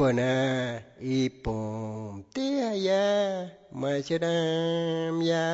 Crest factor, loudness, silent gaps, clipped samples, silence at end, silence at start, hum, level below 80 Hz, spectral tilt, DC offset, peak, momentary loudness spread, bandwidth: 14 dB; -28 LUFS; none; under 0.1%; 0 s; 0 s; none; -54 dBFS; -6 dB/octave; under 0.1%; -14 dBFS; 11 LU; 8 kHz